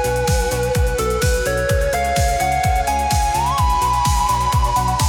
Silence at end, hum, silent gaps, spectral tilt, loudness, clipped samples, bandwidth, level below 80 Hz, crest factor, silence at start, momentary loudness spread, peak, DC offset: 0 s; none; none; -4 dB/octave; -18 LUFS; under 0.1%; 18 kHz; -24 dBFS; 10 dB; 0 s; 2 LU; -6 dBFS; under 0.1%